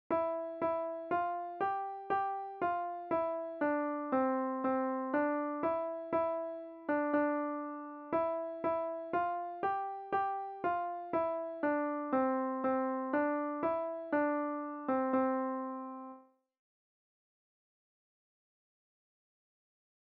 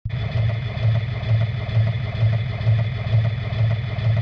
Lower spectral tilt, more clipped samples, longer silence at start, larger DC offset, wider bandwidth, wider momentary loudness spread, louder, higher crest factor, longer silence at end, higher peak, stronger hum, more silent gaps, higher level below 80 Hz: second, -5 dB/octave vs -8.5 dB/octave; neither; about the same, 0.1 s vs 0.05 s; neither; second, 4.7 kHz vs 5.4 kHz; first, 6 LU vs 2 LU; second, -35 LUFS vs -22 LUFS; about the same, 16 dB vs 12 dB; first, 3.85 s vs 0 s; second, -20 dBFS vs -8 dBFS; neither; neither; second, -78 dBFS vs -36 dBFS